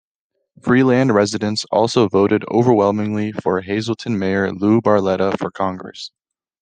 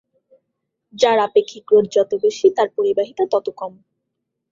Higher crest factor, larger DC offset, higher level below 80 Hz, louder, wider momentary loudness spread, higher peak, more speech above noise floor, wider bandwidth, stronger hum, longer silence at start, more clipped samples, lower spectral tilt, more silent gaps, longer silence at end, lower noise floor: about the same, 16 dB vs 18 dB; neither; first, -58 dBFS vs -66 dBFS; about the same, -17 LUFS vs -18 LUFS; about the same, 9 LU vs 8 LU; about the same, -2 dBFS vs -2 dBFS; about the same, 58 dB vs 60 dB; first, 9.6 kHz vs 7.6 kHz; neither; second, 0.65 s vs 0.95 s; neither; first, -6 dB/octave vs -4.5 dB/octave; neither; second, 0.55 s vs 0.8 s; about the same, -75 dBFS vs -77 dBFS